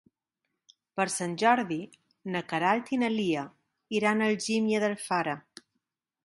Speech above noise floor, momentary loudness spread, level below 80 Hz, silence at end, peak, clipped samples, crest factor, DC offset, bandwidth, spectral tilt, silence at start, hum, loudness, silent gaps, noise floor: 56 dB; 13 LU; -76 dBFS; 0.85 s; -8 dBFS; under 0.1%; 20 dB; under 0.1%; 11.5 kHz; -4.5 dB/octave; 0.95 s; none; -28 LUFS; none; -84 dBFS